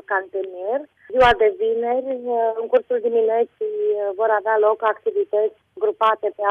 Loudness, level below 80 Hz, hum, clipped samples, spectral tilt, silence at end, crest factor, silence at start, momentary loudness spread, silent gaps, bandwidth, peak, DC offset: -20 LUFS; -50 dBFS; none; under 0.1%; -5.5 dB/octave; 0 s; 14 dB; 0.1 s; 9 LU; none; 6.6 kHz; -6 dBFS; under 0.1%